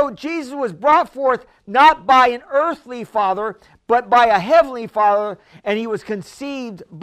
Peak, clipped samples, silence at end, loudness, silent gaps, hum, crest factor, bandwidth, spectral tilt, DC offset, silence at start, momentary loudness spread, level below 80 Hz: 0 dBFS; under 0.1%; 0 s; -17 LUFS; none; none; 18 dB; 14 kHz; -4.5 dB/octave; under 0.1%; 0 s; 15 LU; -54 dBFS